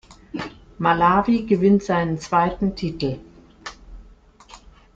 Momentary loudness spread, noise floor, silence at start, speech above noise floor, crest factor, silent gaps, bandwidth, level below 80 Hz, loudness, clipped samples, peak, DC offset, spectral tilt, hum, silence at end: 20 LU; -49 dBFS; 0.1 s; 30 dB; 18 dB; none; 7.8 kHz; -46 dBFS; -20 LUFS; under 0.1%; -4 dBFS; under 0.1%; -7 dB/octave; none; 0.4 s